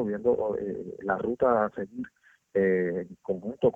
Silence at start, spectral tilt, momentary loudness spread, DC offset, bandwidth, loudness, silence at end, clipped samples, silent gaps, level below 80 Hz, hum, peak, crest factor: 0 s; -9.5 dB/octave; 12 LU; under 0.1%; 3.6 kHz; -28 LUFS; 0.05 s; under 0.1%; none; -62 dBFS; none; -12 dBFS; 16 dB